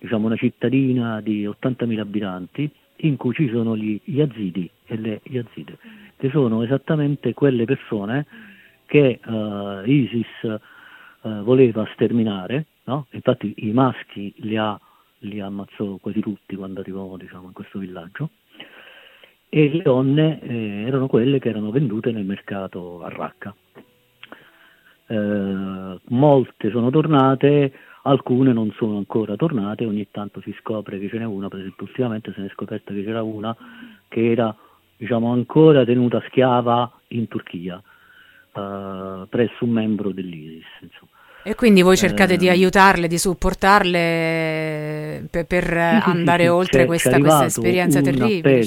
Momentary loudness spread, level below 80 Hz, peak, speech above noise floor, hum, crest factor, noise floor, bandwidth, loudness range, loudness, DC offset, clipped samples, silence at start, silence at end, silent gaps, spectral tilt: 17 LU; -46 dBFS; 0 dBFS; 34 dB; none; 20 dB; -54 dBFS; 17 kHz; 11 LU; -20 LUFS; under 0.1%; under 0.1%; 0 s; 0 s; none; -6 dB/octave